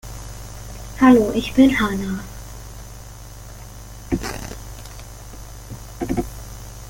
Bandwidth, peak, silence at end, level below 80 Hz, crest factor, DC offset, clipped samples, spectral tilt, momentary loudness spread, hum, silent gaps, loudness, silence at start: 17 kHz; -2 dBFS; 0 s; -36 dBFS; 20 dB; under 0.1%; under 0.1%; -5.5 dB/octave; 23 LU; 50 Hz at -35 dBFS; none; -19 LUFS; 0.05 s